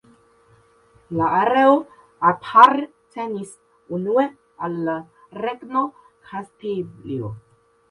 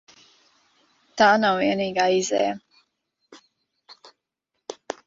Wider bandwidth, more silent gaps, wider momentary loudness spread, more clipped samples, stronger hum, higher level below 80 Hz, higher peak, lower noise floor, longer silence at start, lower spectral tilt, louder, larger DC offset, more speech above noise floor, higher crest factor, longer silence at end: first, 11 kHz vs 7.8 kHz; neither; second, 20 LU vs 23 LU; neither; neither; first, -62 dBFS vs -68 dBFS; first, 0 dBFS vs -6 dBFS; second, -56 dBFS vs -80 dBFS; about the same, 1.1 s vs 1.15 s; first, -6.5 dB/octave vs -3.5 dB/octave; about the same, -20 LUFS vs -21 LUFS; neither; second, 36 dB vs 60 dB; about the same, 22 dB vs 20 dB; first, 0.5 s vs 0.15 s